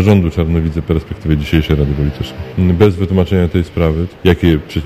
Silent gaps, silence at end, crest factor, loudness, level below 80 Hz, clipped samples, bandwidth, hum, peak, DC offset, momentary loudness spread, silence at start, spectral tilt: none; 0 s; 12 dB; -14 LUFS; -22 dBFS; 0.3%; 15 kHz; none; 0 dBFS; under 0.1%; 6 LU; 0 s; -8 dB/octave